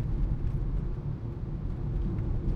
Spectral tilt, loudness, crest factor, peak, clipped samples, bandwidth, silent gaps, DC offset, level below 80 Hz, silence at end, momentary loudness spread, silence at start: -10.5 dB/octave; -34 LUFS; 14 dB; -16 dBFS; under 0.1%; 4.5 kHz; none; under 0.1%; -32 dBFS; 0 s; 4 LU; 0 s